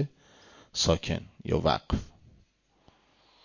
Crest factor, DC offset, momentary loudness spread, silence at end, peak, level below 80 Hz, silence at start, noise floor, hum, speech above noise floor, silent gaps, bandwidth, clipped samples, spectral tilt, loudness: 22 dB; under 0.1%; 10 LU; 1.4 s; -10 dBFS; -44 dBFS; 0 s; -66 dBFS; none; 37 dB; none; 7.4 kHz; under 0.1%; -4.5 dB/octave; -30 LUFS